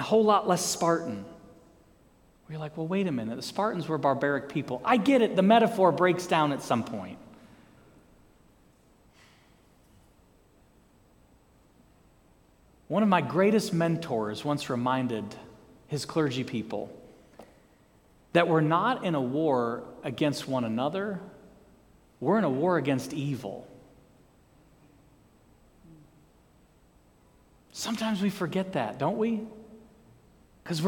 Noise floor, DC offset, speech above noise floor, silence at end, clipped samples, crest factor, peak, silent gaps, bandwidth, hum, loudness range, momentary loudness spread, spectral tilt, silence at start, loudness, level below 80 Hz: -61 dBFS; under 0.1%; 34 dB; 0 s; under 0.1%; 22 dB; -6 dBFS; none; 18 kHz; none; 10 LU; 16 LU; -5.5 dB/octave; 0 s; -27 LUFS; -66 dBFS